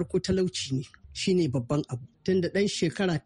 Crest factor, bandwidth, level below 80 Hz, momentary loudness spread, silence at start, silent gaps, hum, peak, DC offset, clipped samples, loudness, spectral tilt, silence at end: 14 dB; 11 kHz; -54 dBFS; 9 LU; 0 s; none; none; -14 dBFS; under 0.1%; under 0.1%; -28 LUFS; -5.5 dB/octave; 0.05 s